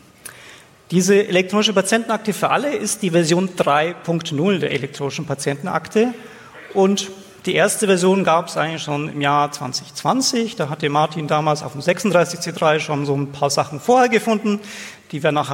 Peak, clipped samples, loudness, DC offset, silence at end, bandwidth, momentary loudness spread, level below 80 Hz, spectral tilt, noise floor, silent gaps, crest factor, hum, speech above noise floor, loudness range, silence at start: -2 dBFS; under 0.1%; -19 LUFS; under 0.1%; 0 s; 16.5 kHz; 10 LU; -64 dBFS; -4.5 dB/octave; -44 dBFS; none; 16 dB; none; 25 dB; 3 LU; 0.25 s